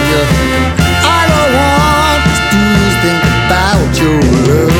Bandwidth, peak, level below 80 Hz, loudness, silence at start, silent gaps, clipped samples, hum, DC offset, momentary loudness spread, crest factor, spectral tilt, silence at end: 18.5 kHz; 0 dBFS; -20 dBFS; -9 LUFS; 0 s; none; under 0.1%; none; under 0.1%; 2 LU; 10 dB; -5 dB/octave; 0 s